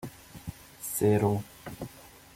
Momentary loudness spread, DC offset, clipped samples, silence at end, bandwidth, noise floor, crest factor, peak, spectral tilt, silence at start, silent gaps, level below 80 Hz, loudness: 20 LU; under 0.1%; under 0.1%; 0.25 s; 16.5 kHz; -50 dBFS; 20 dB; -12 dBFS; -6 dB/octave; 0 s; none; -56 dBFS; -28 LUFS